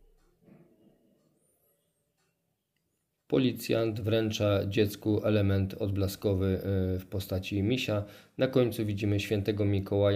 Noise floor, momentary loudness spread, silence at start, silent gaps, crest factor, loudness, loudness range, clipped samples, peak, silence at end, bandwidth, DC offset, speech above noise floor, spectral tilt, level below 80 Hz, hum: -79 dBFS; 5 LU; 3.3 s; none; 18 dB; -30 LUFS; 6 LU; under 0.1%; -12 dBFS; 0 s; 16 kHz; under 0.1%; 51 dB; -7 dB/octave; -60 dBFS; none